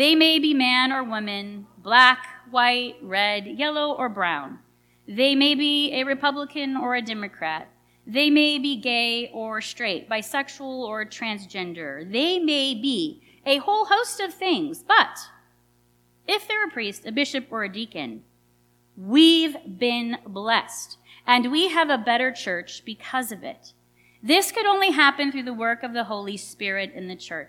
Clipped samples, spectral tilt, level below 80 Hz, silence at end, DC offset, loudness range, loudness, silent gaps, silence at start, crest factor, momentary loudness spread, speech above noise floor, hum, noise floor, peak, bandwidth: under 0.1%; -2.5 dB/octave; -72 dBFS; 0.05 s; under 0.1%; 5 LU; -22 LUFS; none; 0 s; 22 dB; 15 LU; 39 dB; 60 Hz at -55 dBFS; -62 dBFS; -2 dBFS; 17.5 kHz